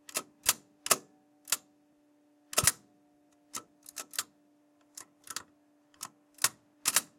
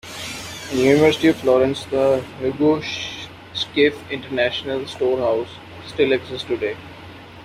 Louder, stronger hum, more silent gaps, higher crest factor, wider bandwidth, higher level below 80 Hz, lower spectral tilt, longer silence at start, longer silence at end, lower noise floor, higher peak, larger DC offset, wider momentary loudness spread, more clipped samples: second, -32 LUFS vs -20 LUFS; neither; neither; first, 30 dB vs 18 dB; about the same, 17 kHz vs 15.5 kHz; second, -66 dBFS vs -54 dBFS; second, 0 dB/octave vs -5 dB/octave; about the same, 0.15 s vs 0.05 s; first, 0.15 s vs 0 s; first, -67 dBFS vs -39 dBFS; second, -6 dBFS vs -2 dBFS; neither; first, 20 LU vs 16 LU; neither